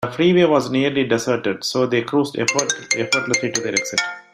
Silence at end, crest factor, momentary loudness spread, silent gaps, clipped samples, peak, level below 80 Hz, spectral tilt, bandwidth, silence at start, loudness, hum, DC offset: 0.15 s; 18 dB; 6 LU; none; under 0.1%; -2 dBFS; -60 dBFS; -3.5 dB/octave; 15 kHz; 0 s; -19 LUFS; none; under 0.1%